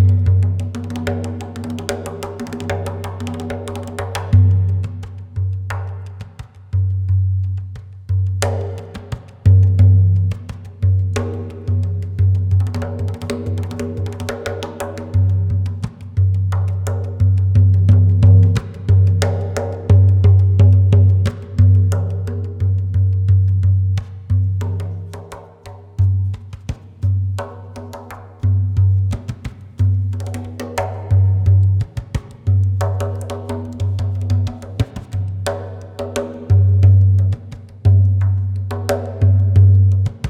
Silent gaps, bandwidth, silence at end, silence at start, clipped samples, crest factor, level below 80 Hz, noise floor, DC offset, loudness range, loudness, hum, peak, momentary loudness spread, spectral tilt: none; 9.2 kHz; 0 s; 0 s; under 0.1%; 16 dB; -38 dBFS; -37 dBFS; under 0.1%; 8 LU; -17 LUFS; none; 0 dBFS; 16 LU; -7.5 dB/octave